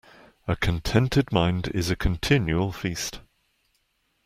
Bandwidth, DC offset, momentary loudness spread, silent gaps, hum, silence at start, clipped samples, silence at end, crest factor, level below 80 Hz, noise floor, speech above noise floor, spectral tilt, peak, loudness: 16 kHz; under 0.1%; 9 LU; none; none; 0.45 s; under 0.1%; 1.05 s; 22 dB; -38 dBFS; -71 dBFS; 47 dB; -5.5 dB/octave; -4 dBFS; -25 LUFS